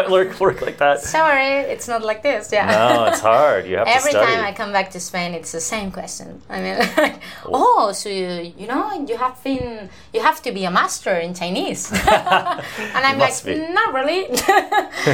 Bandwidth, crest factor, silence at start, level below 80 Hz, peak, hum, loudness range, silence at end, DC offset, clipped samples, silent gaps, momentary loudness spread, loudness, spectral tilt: 17.5 kHz; 18 dB; 0 s; -48 dBFS; 0 dBFS; none; 5 LU; 0 s; 0.4%; under 0.1%; none; 11 LU; -18 LUFS; -3.5 dB/octave